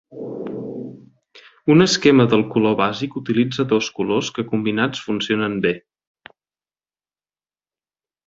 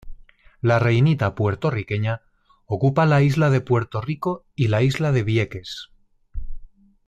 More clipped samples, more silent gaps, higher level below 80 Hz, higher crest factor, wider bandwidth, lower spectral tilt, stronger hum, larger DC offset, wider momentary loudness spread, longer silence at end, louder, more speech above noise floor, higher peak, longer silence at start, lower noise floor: neither; neither; second, -58 dBFS vs -42 dBFS; first, 20 dB vs 14 dB; second, 7.8 kHz vs 11.5 kHz; second, -5.5 dB/octave vs -7.5 dB/octave; neither; neither; about the same, 17 LU vs 16 LU; first, 2.5 s vs 0.4 s; about the same, -19 LUFS vs -21 LUFS; first, over 72 dB vs 28 dB; first, -2 dBFS vs -8 dBFS; about the same, 0.1 s vs 0.05 s; first, under -90 dBFS vs -48 dBFS